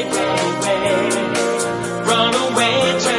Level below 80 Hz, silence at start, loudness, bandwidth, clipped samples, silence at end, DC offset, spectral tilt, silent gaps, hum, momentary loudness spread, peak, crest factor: -54 dBFS; 0 s; -17 LUFS; 11.5 kHz; under 0.1%; 0 s; under 0.1%; -3 dB/octave; none; none; 4 LU; -2 dBFS; 16 dB